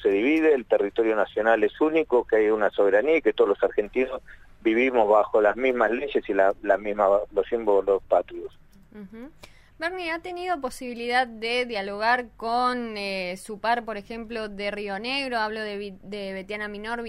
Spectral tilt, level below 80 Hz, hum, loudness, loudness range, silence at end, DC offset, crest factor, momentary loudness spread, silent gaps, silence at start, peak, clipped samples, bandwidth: -5 dB/octave; -54 dBFS; none; -24 LUFS; 7 LU; 0 s; under 0.1%; 18 dB; 12 LU; none; 0 s; -6 dBFS; under 0.1%; 13 kHz